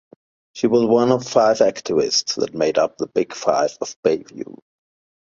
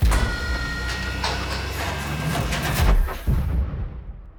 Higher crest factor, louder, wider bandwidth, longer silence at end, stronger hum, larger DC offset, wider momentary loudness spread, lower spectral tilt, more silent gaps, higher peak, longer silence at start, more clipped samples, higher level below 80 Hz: about the same, 18 dB vs 16 dB; first, -19 LUFS vs -25 LUFS; second, 7.6 kHz vs over 20 kHz; first, 0.7 s vs 0 s; neither; neither; first, 9 LU vs 6 LU; about the same, -4 dB/octave vs -4.5 dB/octave; first, 3.96-4.03 s vs none; first, -2 dBFS vs -6 dBFS; first, 0.55 s vs 0 s; neither; second, -62 dBFS vs -24 dBFS